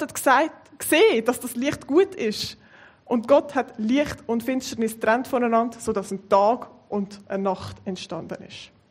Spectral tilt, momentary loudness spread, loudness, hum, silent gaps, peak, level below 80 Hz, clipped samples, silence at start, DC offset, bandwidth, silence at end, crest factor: -4 dB/octave; 13 LU; -23 LUFS; none; none; -4 dBFS; -60 dBFS; under 0.1%; 0 s; under 0.1%; 16 kHz; 0.25 s; 20 dB